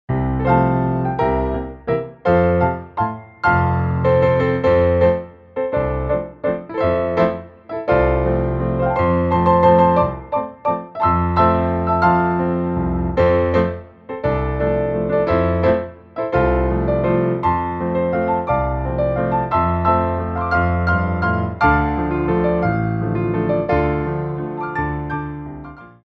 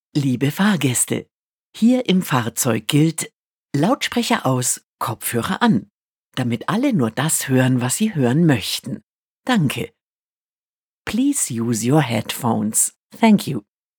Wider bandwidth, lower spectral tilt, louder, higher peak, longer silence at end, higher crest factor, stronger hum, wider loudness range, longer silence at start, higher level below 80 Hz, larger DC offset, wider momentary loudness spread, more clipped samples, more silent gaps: second, 5.8 kHz vs over 20 kHz; first, -10 dB/octave vs -4.5 dB/octave; about the same, -18 LUFS vs -19 LUFS; about the same, -2 dBFS vs 0 dBFS; second, 0.15 s vs 0.4 s; about the same, 16 dB vs 20 dB; neither; about the same, 3 LU vs 3 LU; about the same, 0.1 s vs 0.15 s; first, -32 dBFS vs -62 dBFS; neither; about the same, 9 LU vs 10 LU; neither; second, none vs 1.32-1.73 s, 3.34-3.69 s, 4.84-4.97 s, 5.90-6.32 s, 9.03-9.43 s, 10.02-11.05 s, 12.96-13.10 s